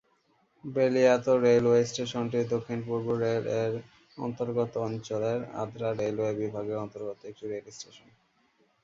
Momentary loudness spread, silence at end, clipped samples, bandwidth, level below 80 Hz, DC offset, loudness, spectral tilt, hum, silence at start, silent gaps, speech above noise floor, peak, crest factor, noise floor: 16 LU; 0.85 s; under 0.1%; 7.8 kHz; -66 dBFS; under 0.1%; -29 LUFS; -6 dB/octave; none; 0.65 s; none; 41 dB; -10 dBFS; 18 dB; -69 dBFS